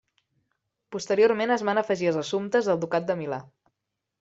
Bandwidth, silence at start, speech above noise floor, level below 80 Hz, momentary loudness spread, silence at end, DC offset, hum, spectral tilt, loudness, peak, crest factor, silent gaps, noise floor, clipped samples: 8 kHz; 0.9 s; 59 dB; -72 dBFS; 13 LU; 0.8 s; under 0.1%; none; -5 dB/octave; -25 LUFS; -8 dBFS; 18 dB; none; -83 dBFS; under 0.1%